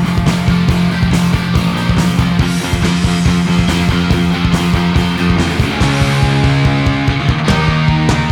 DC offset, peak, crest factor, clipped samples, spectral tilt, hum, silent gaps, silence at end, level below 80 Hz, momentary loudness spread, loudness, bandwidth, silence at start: under 0.1%; 0 dBFS; 12 dB; under 0.1%; -6 dB/octave; none; none; 0 s; -22 dBFS; 2 LU; -13 LUFS; 15.5 kHz; 0 s